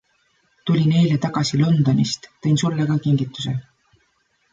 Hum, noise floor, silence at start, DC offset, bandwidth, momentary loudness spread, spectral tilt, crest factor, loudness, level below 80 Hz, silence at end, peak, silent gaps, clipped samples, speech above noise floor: none; -65 dBFS; 0.65 s; under 0.1%; 7.8 kHz; 10 LU; -6.5 dB/octave; 14 dB; -20 LUFS; -56 dBFS; 0.9 s; -6 dBFS; none; under 0.1%; 47 dB